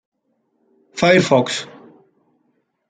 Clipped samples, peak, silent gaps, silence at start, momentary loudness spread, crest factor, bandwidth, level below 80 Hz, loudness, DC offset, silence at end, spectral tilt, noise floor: under 0.1%; -2 dBFS; none; 0.95 s; 21 LU; 18 dB; 9.4 kHz; -60 dBFS; -16 LUFS; under 0.1%; 1.25 s; -5 dB/octave; -68 dBFS